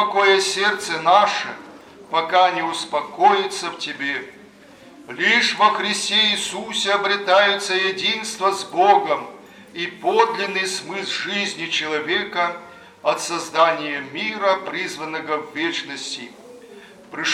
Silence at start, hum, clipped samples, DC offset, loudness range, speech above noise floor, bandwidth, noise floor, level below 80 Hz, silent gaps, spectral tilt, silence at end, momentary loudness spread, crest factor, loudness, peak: 0 s; none; under 0.1%; under 0.1%; 5 LU; 25 dB; 15.5 kHz; -46 dBFS; -70 dBFS; none; -2 dB/octave; 0 s; 13 LU; 20 dB; -20 LUFS; -2 dBFS